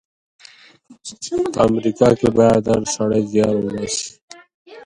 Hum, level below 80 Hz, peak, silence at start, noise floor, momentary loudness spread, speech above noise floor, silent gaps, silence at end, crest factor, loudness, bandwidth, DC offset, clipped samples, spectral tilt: none; -48 dBFS; 0 dBFS; 0.9 s; -47 dBFS; 15 LU; 29 dB; 4.22-4.28 s, 4.54-4.65 s; 0 s; 18 dB; -17 LUFS; 11.5 kHz; under 0.1%; under 0.1%; -5.5 dB/octave